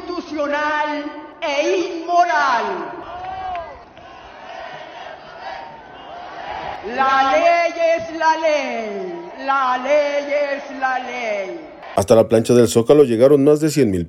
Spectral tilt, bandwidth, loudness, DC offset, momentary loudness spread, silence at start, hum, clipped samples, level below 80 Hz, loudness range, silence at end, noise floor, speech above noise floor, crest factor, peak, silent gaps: -5 dB/octave; 16 kHz; -17 LUFS; under 0.1%; 20 LU; 0 s; none; under 0.1%; -54 dBFS; 16 LU; 0 s; -40 dBFS; 23 dB; 18 dB; 0 dBFS; none